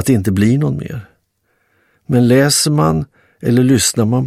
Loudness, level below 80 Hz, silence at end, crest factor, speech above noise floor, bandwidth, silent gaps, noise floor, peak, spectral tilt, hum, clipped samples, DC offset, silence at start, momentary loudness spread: -14 LUFS; -42 dBFS; 0 s; 14 dB; 51 dB; 15.5 kHz; none; -63 dBFS; 0 dBFS; -5 dB/octave; none; under 0.1%; under 0.1%; 0 s; 13 LU